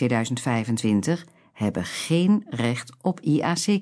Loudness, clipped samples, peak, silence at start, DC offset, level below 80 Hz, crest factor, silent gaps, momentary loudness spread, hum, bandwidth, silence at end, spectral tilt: -24 LUFS; under 0.1%; -8 dBFS; 0 s; under 0.1%; -62 dBFS; 16 dB; none; 7 LU; none; 11 kHz; 0 s; -5.5 dB/octave